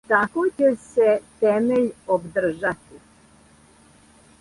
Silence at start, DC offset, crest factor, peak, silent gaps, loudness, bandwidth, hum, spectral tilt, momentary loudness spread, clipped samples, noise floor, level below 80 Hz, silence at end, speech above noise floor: 0.1 s; under 0.1%; 18 dB; -4 dBFS; none; -21 LUFS; 11.5 kHz; none; -6.5 dB/octave; 6 LU; under 0.1%; -53 dBFS; -58 dBFS; 1.65 s; 32 dB